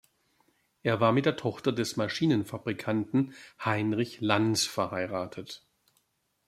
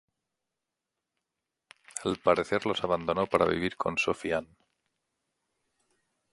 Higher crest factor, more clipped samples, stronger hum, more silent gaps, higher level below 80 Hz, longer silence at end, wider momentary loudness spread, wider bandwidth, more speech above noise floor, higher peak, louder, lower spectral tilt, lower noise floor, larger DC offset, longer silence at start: about the same, 22 dB vs 24 dB; neither; neither; neither; second, -70 dBFS vs -60 dBFS; second, 0.9 s vs 1.9 s; first, 11 LU vs 8 LU; first, 15.5 kHz vs 11.5 kHz; second, 46 dB vs 59 dB; about the same, -8 dBFS vs -8 dBFS; about the same, -29 LUFS vs -29 LUFS; about the same, -5 dB/octave vs -4.5 dB/octave; second, -75 dBFS vs -87 dBFS; neither; second, 0.85 s vs 1.95 s